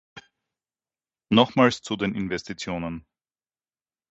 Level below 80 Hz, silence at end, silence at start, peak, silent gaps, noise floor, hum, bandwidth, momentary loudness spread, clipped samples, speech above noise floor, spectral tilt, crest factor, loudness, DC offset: -56 dBFS; 1.15 s; 0.15 s; -4 dBFS; none; under -90 dBFS; none; 8 kHz; 13 LU; under 0.1%; over 67 dB; -5.5 dB/octave; 24 dB; -24 LUFS; under 0.1%